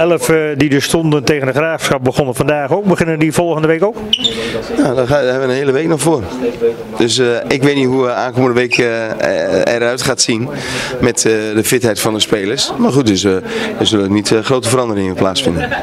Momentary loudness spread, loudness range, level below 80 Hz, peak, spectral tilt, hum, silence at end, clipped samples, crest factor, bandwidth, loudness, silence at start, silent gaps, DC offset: 4 LU; 1 LU; -42 dBFS; 0 dBFS; -4.5 dB/octave; none; 0 s; under 0.1%; 14 dB; 16 kHz; -13 LUFS; 0 s; none; under 0.1%